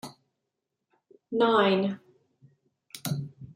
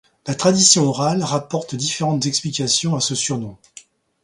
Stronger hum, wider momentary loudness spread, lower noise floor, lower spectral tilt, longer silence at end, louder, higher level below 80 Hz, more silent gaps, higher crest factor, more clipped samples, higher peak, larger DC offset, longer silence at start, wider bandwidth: neither; first, 22 LU vs 13 LU; first, -84 dBFS vs -47 dBFS; first, -5.5 dB/octave vs -3.5 dB/octave; second, 0.05 s vs 0.7 s; second, -27 LUFS vs -18 LUFS; second, -72 dBFS vs -58 dBFS; neither; about the same, 22 dB vs 20 dB; neither; second, -8 dBFS vs 0 dBFS; neither; second, 0.05 s vs 0.25 s; first, 16 kHz vs 11.5 kHz